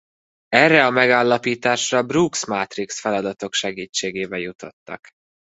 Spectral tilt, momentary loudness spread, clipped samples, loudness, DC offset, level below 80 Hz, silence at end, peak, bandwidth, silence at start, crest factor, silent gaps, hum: -3.5 dB/octave; 19 LU; under 0.1%; -19 LUFS; under 0.1%; -62 dBFS; 0.6 s; 0 dBFS; 8.2 kHz; 0.5 s; 20 dB; 3.89-3.93 s, 4.55-4.59 s, 4.73-4.86 s; none